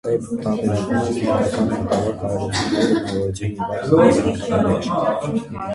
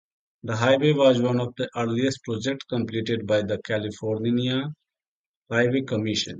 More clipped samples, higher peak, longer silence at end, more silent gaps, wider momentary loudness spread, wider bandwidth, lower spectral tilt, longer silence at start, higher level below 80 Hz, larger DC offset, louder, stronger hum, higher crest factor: neither; first, -2 dBFS vs -6 dBFS; about the same, 0 s vs 0 s; second, none vs 5.08-5.42 s; about the same, 9 LU vs 9 LU; first, 11.5 kHz vs 8.8 kHz; about the same, -6.5 dB/octave vs -6 dB/octave; second, 0.05 s vs 0.45 s; first, -42 dBFS vs -60 dBFS; neither; first, -20 LUFS vs -24 LUFS; neither; about the same, 18 dB vs 18 dB